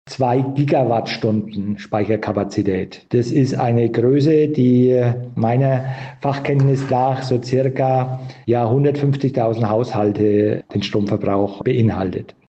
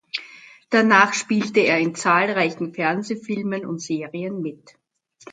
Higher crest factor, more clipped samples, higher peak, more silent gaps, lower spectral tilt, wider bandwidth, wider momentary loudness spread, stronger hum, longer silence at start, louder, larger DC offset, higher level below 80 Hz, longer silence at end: second, 12 dB vs 22 dB; neither; second, -6 dBFS vs 0 dBFS; neither; first, -8.5 dB/octave vs -4.5 dB/octave; second, 8.2 kHz vs 9.4 kHz; second, 7 LU vs 14 LU; neither; about the same, 0.05 s vs 0.15 s; first, -18 LUFS vs -21 LUFS; neither; first, -56 dBFS vs -70 dBFS; first, 0.2 s vs 0 s